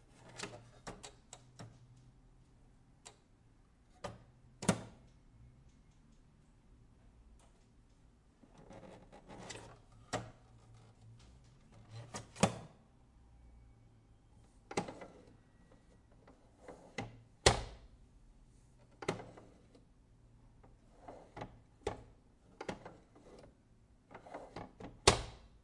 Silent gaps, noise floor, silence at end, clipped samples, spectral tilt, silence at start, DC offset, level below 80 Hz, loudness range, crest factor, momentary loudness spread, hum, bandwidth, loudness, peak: none; -66 dBFS; 0.15 s; under 0.1%; -3.5 dB/octave; 0.2 s; under 0.1%; -58 dBFS; 17 LU; 36 dB; 27 LU; none; 11.5 kHz; -40 LUFS; -10 dBFS